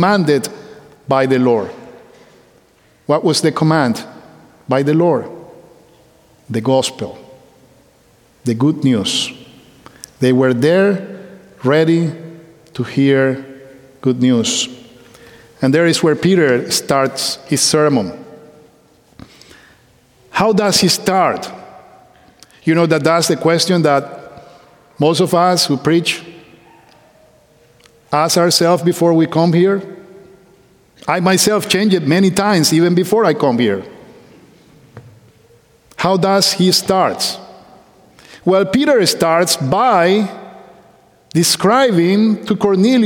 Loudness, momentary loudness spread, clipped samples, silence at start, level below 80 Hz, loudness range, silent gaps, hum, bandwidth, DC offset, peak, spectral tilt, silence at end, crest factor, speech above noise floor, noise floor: -14 LUFS; 13 LU; under 0.1%; 0 s; -56 dBFS; 5 LU; none; none; 18 kHz; under 0.1%; 0 dBFS; -4.5 dB/octave; 0 s; 16 dB; 38 dB; -52 dBFS